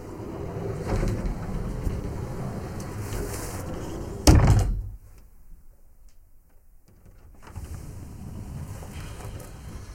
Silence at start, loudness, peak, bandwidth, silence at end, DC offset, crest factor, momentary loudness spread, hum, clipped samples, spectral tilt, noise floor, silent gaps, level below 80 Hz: 0 s; -28 LUFS; 0 dBFS; 16.5 kHz; 0 s; under 0.1%; 28 dB; 20 LU; none; under 0.1%; -6 dB/octave; -52 dBFS; none; -32 dBFS